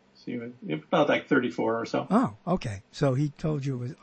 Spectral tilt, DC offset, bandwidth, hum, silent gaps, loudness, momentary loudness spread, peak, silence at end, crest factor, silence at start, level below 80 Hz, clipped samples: -7 dB/octave; under 0.1%; 8.8 kHz; none; none; -28 LUFS; 13 LU; -12 dBFS; 0.1 s; 16 dB; 0.25 s; -56 dBFS; under 0.1%